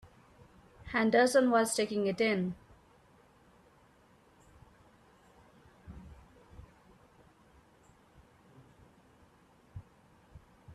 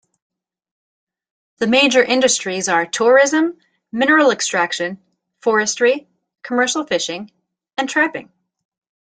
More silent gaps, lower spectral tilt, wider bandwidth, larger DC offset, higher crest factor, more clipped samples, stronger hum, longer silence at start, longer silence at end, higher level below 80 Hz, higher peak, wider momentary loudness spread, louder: neither; first, -4.5 dB/octave vs -2 dB/octave; first, 13.5 kHz vs 9.6 kHz; neither; about the same, 22 dB vs 18 dB; neither; neither; second, 0.85 s vs 1.6 s; second, 0 s vs 0.9 s; about the same, -64 dBFS vs -66 dBFS; second, -14 dBFS vs -2 dBFS; first, 28 LU vs 12 LU; second, -29 LUFS vs -16 LUFS